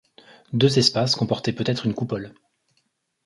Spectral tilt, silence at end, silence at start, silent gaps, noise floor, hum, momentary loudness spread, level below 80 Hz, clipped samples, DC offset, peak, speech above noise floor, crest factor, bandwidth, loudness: -5 dB/octave; 0.95 s; 0.5 s; none; -71 dBFS; none; 13 LU; -58 dBFS; under 0.1%; under 0.1%; -4 dBFS; 49 dB; 20 dB; 11.5 kHz; -22 LUFS